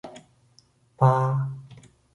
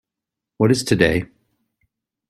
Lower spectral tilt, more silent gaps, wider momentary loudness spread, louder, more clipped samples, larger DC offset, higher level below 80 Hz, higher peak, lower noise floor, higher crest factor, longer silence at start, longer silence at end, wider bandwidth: first, -9 dB/octave vs -5.5 dB/octave; neither; first, 22 LU vs 10 LU; second, -23 LUFS vs -18 LUFS; neither; neither; second, -62 dBFS vs -46 dBFS; second, -8 dBFS vs -2 dBFS; second, -61 dBFS vs -85 dBFS; about the same, 18 dB vs 20 dB; second, 0.05 s vs 0.6 s; second, 0.4 s vs 1.05 s; second, 11 kHz vs 14 kHz